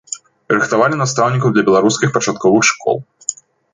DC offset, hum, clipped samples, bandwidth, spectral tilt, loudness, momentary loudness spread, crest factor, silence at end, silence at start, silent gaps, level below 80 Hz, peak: under 0.1%; none; under 0.1%; 9.6 kHz; -4.5 dB/octave; -15 LUFS; 13 LU; 16 dB; 0.4 s; 0.1 s; none; -56 dBFS; 0 dBFS